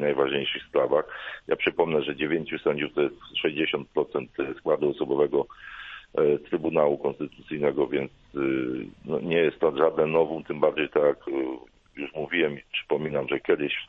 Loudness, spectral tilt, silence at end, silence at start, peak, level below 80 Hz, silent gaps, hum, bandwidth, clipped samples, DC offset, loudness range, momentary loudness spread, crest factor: -26 LUFS; -8 dB/octave; 0.05 s; 0 s; -6 dBFS; -60 dBFS; none; none; 4.1 kHz; under 0.1%; under 0.1%; 2 LU; 10 LU; 20 dB